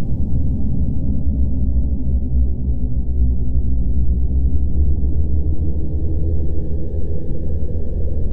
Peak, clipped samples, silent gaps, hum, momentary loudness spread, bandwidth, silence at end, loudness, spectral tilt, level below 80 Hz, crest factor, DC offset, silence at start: -4 dBFS; under 0.1%; none; none; 5 LU; 1 kHz; 0 s; -22 LUFS; -13.5 dB/octave; -20 dBFS; 10 dB; under 0.1%; 0 s